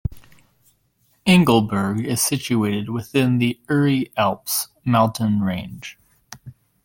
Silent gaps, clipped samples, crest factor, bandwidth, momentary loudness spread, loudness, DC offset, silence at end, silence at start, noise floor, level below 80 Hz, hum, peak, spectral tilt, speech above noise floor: none; under 0.1%; 18 dB; 17 kHz; 18 LU; -20 LUFS; under 0.1%; 0.35 s; 0.05 s; -64 dBFS; -48 dBFS; none; -2 dBFS; -5 dB/octave; 44 dB